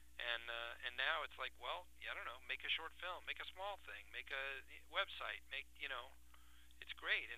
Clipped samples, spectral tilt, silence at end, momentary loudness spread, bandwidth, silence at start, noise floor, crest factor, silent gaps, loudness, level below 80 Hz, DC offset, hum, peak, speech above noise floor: under 0.1%; -1.5 dB/octave; 0 s; 10 LU; 15.5 kHz; 0 s; -66 dBFS; 24 dB; none; -45 LUFS; -68 dBFS; under 0.1%; 60 Hz at -70 dBFS; -24 dBFS; 19 dB